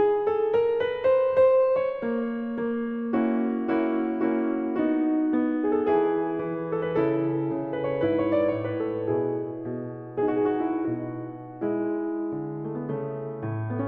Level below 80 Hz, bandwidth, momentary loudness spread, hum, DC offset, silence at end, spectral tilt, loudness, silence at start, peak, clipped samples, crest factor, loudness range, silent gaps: -64 dBFS; 4.5 kHz; 9 LU; none; under 0.1%; 0 s; -10.5 dB/octave; -26 LUFS; 0 s; -12 dBFS; under 0.1%; 14 dB; 5 LU; none